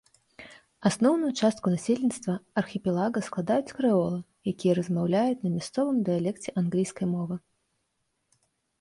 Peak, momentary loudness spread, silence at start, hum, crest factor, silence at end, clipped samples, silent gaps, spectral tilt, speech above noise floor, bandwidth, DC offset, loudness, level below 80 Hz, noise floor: -10 dBFS; 8 LU; 0.4 s; none; 18 dB; 1.4 s; under 0.1%; none; -6.5 dB/octave; 51 dB; 11.5 kHz; under 0.1%; -27 LUFS; -66 dBFS; -77 dBFS